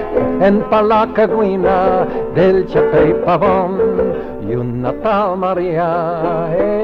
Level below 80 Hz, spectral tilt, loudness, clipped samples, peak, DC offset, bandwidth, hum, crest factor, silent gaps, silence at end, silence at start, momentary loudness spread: -36 dBFS; -9 dB/octave; -15 LUFS; under 0.1%; -2 dBFS; under 0.1%; 5.8 kHz; none; 12 dB; none; 0 s; 0 s; 6 LU